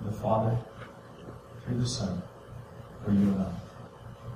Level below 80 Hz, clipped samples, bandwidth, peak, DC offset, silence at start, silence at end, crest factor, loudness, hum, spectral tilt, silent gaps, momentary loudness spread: -52 dBFS; under 0.1%; 12 kHz; -12 dBFS; under 0.1%; 0 s; 0 s; 20 dB; -30 LUFS; none; -7 dB/octave; none; 20 LU